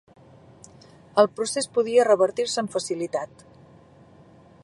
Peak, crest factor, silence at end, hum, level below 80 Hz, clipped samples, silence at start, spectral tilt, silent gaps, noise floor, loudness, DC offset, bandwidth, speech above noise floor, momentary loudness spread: -4 dBFS; 22 dB; 1.4 s; none; -68 dBFS; under 0.1%; 1.15 s; -3.5 dB/octave; none; -52 dBFS; -23 LUFS; under 0.1%; 11.5 kHz; 29 dB; 10 LU